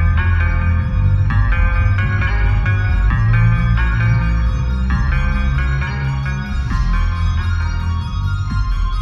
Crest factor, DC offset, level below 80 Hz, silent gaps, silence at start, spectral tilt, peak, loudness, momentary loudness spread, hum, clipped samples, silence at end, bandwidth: 12 dB; under 0.1%; -18 dBFS; none; 0 s; -7.5 dB/octave; -4 dBFS; -17 LUFS; 6 LU; none; under 0.1%; 0 s; 7 kHz